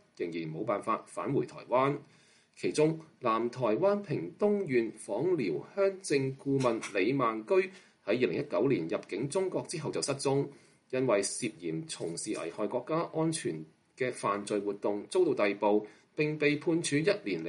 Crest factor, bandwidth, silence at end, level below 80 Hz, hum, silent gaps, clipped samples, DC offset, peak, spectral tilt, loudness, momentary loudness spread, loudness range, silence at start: 18 dB; 11.5 kHz; 0 s; -76 dBFS; none; none; under 0.1%; under 0.1%; -14 dBFS; -5 dB/octave; -32 LUFS; 8 LU; 3 LU; 0.2 s